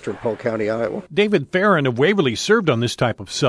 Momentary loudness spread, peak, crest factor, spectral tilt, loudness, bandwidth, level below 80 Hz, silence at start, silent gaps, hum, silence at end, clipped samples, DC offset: 6 LU; -2 dBFS; 16 dB; -5 dB/octave; -19 LUFS; 11 kHz; -54 dBFS; 0 s; none; none; 0 s; under 0.1%; under 0.1%